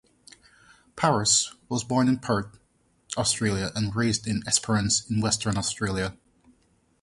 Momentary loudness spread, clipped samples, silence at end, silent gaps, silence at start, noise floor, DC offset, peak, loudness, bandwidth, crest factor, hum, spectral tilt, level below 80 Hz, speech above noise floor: 8 LU; under 0.1%; 0.9 s; none; 0.95 s; -66 dBFS; under 0.1%; -6 dBFS; -25 LUFS; 11.5 kHz; 20 dB; none; -3.5 dB/octave; -50 dBFS; 41 dB